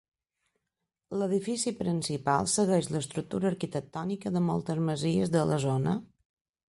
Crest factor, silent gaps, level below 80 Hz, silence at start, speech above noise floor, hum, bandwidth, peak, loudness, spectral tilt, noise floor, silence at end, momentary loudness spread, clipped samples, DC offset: 18 dB; none; -62 dBFS; 1.1 s; 57 dB; none; 11.5 kHz; -12 dBFS; -30 LUFS; -5.5 dB/octave; -86 dBFS; 0.65 s; 8 LU; under 0.1%; under 0.1%